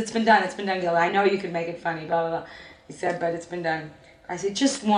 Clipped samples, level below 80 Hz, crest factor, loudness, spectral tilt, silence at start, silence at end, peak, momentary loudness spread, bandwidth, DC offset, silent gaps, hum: under 0.1%; -64 dBFS; 18 dB; -25 LUFS; -4 dB/octave; 0 s; 0 s; -6 dBFS; 15 LU; 10.5 kHz; under 0.1%; none; none